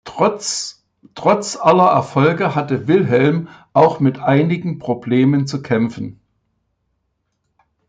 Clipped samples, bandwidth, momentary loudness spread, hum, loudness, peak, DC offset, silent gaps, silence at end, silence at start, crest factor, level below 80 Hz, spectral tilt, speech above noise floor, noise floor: under 0.1%; 9.4 kHz; 10 LU; none; -16 LUFS; -2 dBFS; under 0.1%; none; 1.75 s; 0.05 s; 16 dB; -58 dBFS; -6 dB/octave; 55 dB; -70 dBFS